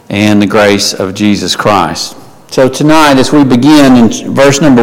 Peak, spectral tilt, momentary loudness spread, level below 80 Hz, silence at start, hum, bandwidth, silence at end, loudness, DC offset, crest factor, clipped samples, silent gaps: 0 dBFS; -5 dB/octave; 7 LU; -36 dBFS; 0.1 s; none; 16.5 kHz; 0 s; -7 LUFS; under 0.1%; 6 dB; 0.4%; none